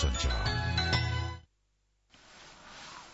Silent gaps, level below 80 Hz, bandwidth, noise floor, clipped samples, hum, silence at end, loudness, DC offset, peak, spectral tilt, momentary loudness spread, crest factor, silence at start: none; -40 dBFS; 8 kHz; -74 dBFS; under 0.1%; 50 Hz at -65 dBFS; 0 s; -31 LUFS; under 0.1%; -16 dBFS; -4 dB/octave; 22 LU; 18 dB; 0 s